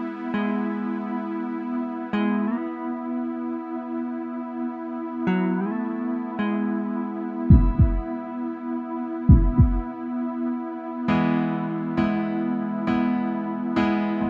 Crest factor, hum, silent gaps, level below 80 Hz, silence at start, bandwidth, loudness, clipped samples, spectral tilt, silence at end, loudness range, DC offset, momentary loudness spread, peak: 20 dB; none; none; -30 dBFS; 0 s; 5.4 kHz; -25 LUFS; under 0.1%; -10 dB/octave; 0 s; 6 LU; under 0.1%; 12 LU; -4 dBFS